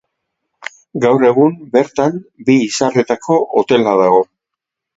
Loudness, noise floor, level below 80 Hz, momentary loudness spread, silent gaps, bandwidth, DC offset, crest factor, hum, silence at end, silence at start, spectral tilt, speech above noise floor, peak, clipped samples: -14 LUFS; -81 dBFS; -58 dBFS; 14 LU; none; 8 kHz; under 0.1%; 14 dB; none; 0.7 s; 0.95 s; -5.5 dB/octave; 68 dB; 0 dBFS; under 0.1%